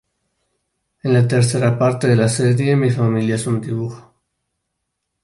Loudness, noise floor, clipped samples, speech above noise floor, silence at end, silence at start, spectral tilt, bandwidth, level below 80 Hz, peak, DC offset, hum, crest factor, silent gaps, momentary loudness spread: -17 LUFS; -76 dBFS; under 0.1%; 60 dB; 1.25 s; 1.05 s; -6.5 dB/octave; 11.5 kHz; -54 dBFS; -4 dBFS; under 0.1%; none; 16 dB; none; 9 LU